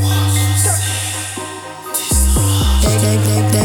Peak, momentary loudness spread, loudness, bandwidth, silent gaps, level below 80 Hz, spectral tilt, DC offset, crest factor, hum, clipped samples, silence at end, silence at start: -2 dBFS; 10 LU; -15 LUFS; 19 kHz; none; -22 dBFS; -4 dB/octave; under 0.1%; 12 dB; none; under 0.1%; 0 s; 0 s